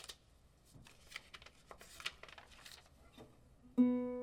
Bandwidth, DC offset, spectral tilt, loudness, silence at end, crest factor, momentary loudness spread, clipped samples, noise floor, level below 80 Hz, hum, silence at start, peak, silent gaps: 14.5 kHz; under 0.1%; -4.5 dB/octave; -39 LUFS; 0 s; 22 dB; 27 LU; under 0.1%; -68 dBFS; -70 dBFS; none; 0 s; -22 dBFS; none